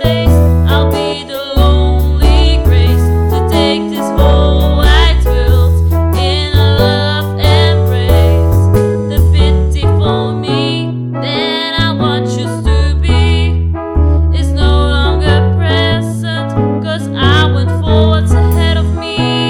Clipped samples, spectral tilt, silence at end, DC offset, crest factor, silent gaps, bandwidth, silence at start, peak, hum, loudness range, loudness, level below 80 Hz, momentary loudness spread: under 0.1%; -6.5 dB/octave; 0 s; under 0.1%; 10 dB; none; 17 kHz; 0 s; 0 dBFS; none; 3 LU; -11 LUFS; -14 dBFS; 6 LU